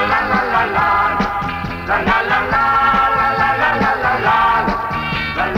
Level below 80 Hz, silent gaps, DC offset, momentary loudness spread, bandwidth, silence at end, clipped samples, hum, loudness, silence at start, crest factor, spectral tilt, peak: -36 dBFS; none; under 0.1%; 6 LU; 17 kHz; 0 s; under 0.1%; none; -15 LUFS; 0 s; 12 dB; -6 dB/octave; -4 dBFS